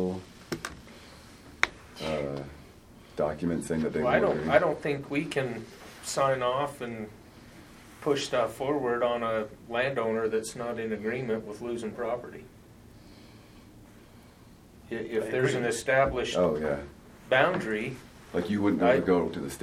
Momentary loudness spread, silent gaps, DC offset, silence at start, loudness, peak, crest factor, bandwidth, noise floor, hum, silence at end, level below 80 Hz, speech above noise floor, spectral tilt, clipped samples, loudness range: 18 LU; none; under 0.1%; 0 s; -29 LUFS; -2 dBFS; 28 dB; 16 kHz; -53 dBFS; none; 0 s; -54 dBFS; 25 dB; -5 dB/octave; under 0.1%; 8 LU